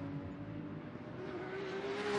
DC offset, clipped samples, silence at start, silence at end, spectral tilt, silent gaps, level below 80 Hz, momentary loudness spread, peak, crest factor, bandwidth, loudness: under 0.1%; under 0.1%; 0 s; 0 s; -6 dB/octave; none; -66 dBFS; 6 LU; -24 dBFS; 16 dB; 11 kHz; -44 LUFS